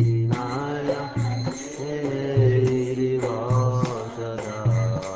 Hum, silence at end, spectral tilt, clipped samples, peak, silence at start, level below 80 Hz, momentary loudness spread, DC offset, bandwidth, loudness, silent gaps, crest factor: none; 0 s; -7.5 dB/octave; under 0.1%; -8 dBFS; 0 s; -48 dBFS; 10 LU; under 0.1%; 8 kHz; -24 LUFS; none; 14 dB